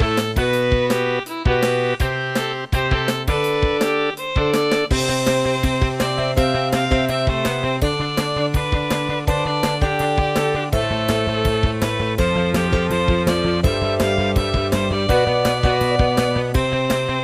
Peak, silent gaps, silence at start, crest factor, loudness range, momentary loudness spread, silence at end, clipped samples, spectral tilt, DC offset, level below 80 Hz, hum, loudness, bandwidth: -4 dBFS; none; 0 s; 16 dB; 2 LU; 3 LU; 0 s; under 0.1%; -5.5 dB/octave; under 0.1%; -28 dBFS; none; -19 LUFS; 16 kHz